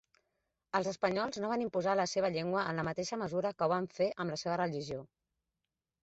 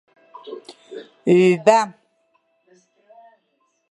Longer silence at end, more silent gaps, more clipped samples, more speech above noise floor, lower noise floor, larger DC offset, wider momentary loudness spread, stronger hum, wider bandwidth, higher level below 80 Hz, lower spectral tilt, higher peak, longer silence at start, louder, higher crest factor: second, 0.95 s vs 2 s; neither; neither; first, 55 dB vs 51 dB; first, -90 dBFS vs -68 dBFS; neither; second, 5 LU vs 24 LU; neither; second, 8 kHz vs 11.5 kHz; about the same, -70 dBFS vs -74 dBFS; second, -4.5 dB/octave vs -6 dB/octave; second, -16 dBFS vs -2 dBFS; first, 0.75 s vs 0.45 s; second, -35 LUFS vs -17 LUFS; about the same, 20 dB vs 20 dB